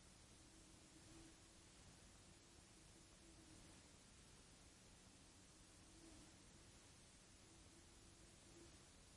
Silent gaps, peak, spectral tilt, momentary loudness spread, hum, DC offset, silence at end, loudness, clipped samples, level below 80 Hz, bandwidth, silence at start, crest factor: none; -52 dBFS; -3 dB/octave; 2 LU; none; under 0.1%; 0 s; -66 LUFS; under 0.1%; -74 dBFS; 12 kHz; 0 s; 14 dB